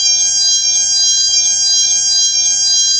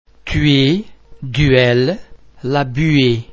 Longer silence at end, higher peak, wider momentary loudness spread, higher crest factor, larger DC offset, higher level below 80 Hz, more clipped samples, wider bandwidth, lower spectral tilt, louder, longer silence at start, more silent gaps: about the same, 0 s vs 0 s; about the same, -2 dBFS vs 0 dBFS; second, 1 LU vs 13 LU; second, 10 dB vs 16 dB; neither; second, -58 dBFS vs -32 dBFS; neither; first, 11 kHz vs 7.6 kHz; second, 4 dB/octave vs -7 dB/octave; first, -9 LUFS vs -15 LUFS; second, 0 s vs 0.25 s; neither